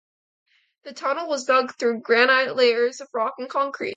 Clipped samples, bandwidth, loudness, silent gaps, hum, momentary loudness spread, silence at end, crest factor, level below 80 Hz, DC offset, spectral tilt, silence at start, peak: under 0.1%; 8.6 kHz; -21 LUFS; none; none; 10 LU; 0 s; 20 dB; -80 dBFS; under 0.1%; -2 dB/octave; 0.85 s; -4 dBFS